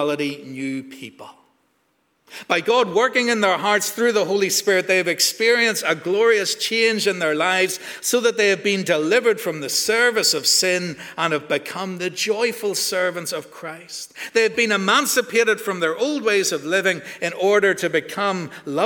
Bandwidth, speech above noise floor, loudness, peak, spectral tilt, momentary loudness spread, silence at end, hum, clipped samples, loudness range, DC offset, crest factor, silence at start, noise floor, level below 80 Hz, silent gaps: 20 kHz; 46 dB; -19 LUFS; -2 dBFS; -2.5 dB/octave; 12 LU; 0 s; none; under 0.1%; 5 LU; under 0.1%; 18 dB; 0 s; -66 dBFS; -72 dBFS; none